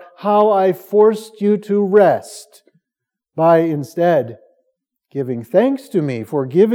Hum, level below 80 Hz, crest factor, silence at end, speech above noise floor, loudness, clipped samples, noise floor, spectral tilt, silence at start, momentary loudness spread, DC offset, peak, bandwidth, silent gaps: none; -80 dBFS; 16 dB; 0 s; 68 dB; -16 LUFS; under 0.1%; -83 dBFS; -7.5 dB/octave; 0 s; 13 LU; under 0.1%; 0 dBFS; 16.5 kHz; none